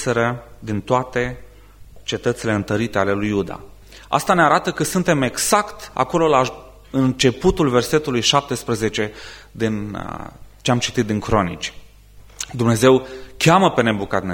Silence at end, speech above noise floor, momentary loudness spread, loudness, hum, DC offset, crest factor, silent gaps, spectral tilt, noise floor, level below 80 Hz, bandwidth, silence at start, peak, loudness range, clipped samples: 0 s; 26 dB; 15 LU; -19 LUFS; none; under 0.1%; 20 dB; none; -4.5 dB/octave; -44 dBFS; -42 dBFS; 16.5 kHz; 0 s; 0 dBFS; 5 LU; under 0.1%